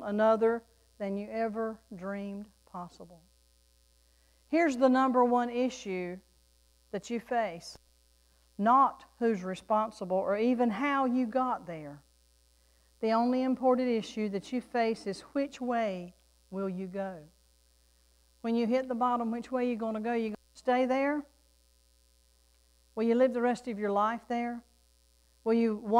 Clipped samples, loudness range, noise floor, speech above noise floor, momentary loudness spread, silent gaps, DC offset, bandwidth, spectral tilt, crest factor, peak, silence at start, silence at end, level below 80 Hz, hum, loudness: under 0.1%; 7 LU; -66 dBFS; 36 dB; 16 LU; none; under 0.1%; 11.5 kHz; -6 dB/octave; 18 dB; -14 dBFS; 0 s; 0 s; -68 dBFS; none; -31 LUFS